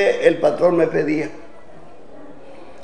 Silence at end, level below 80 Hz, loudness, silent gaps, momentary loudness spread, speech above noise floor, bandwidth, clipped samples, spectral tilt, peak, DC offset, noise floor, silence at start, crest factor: 0 s; -58 dBFS; -18 LUFS; none; 8 LU; 27 dB; 9.8 kHz; under 0.1%; -6.5 dB/octave; 0 dBFS; 2%; -44 dBFS; 0 s; 20 dB